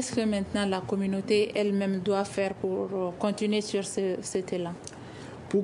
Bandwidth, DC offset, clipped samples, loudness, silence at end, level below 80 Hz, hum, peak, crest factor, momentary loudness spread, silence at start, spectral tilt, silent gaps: 11 kHz; under 0.1%; under 0.1%; -29 LUFS; 0 s; -62 dBFS; none; -12 dBFS; 16 dB; 10 LU; 0 s; -5 dB/octave; none